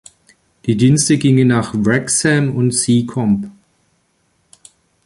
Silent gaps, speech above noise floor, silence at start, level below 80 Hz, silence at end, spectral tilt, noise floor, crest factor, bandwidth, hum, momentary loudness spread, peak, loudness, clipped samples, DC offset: none; 48 dB; 0.65 s; -48 dBFS; 1.55 s; -5 dB/octave; -62 dBFS; 16 dB; 11.5 kHz; none; 8 LU; -2 dBFS; -14 LUFS; under 0.1%; under 0.1%